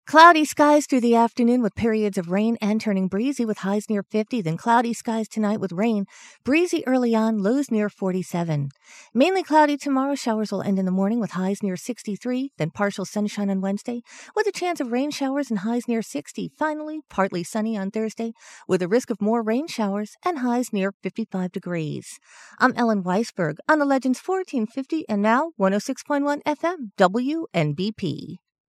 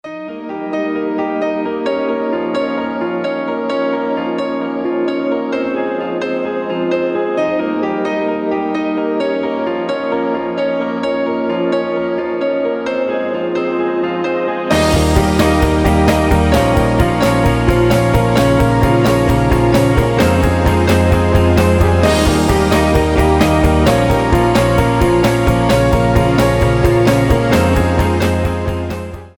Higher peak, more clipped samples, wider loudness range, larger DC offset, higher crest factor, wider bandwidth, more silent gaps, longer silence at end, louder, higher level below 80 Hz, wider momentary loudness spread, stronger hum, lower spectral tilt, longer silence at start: about the same, 0 dBFS vs 0 dBFS; neither; about the same, 4 LU vs 6 LU; neither; first, 22 dB vs 14 dB; second, 14 kHz vs 20 kHz; first, 20.94-21.00 s vs none; first, 0.35 s vs 0.05 s; second, -23 LUFS vs -15 LUFS; second, -64 dBFS vs -24 dBFS; first, 10 LU vs 7 LU; neither; about the same, -5.5 dB/octave vs -6.5 dB/octave; about the same, 0.05 s vs 0.05 s